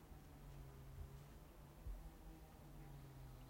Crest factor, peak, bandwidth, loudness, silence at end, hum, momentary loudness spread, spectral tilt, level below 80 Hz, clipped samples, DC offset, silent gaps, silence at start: 16 dB; -42 dBFS; 16.5 kHz; -60 LUFS; 0 s; none; 5 LU; -6 dB/octave; -60 dBFS; under 0.1%; under 0.1%; none; 0 s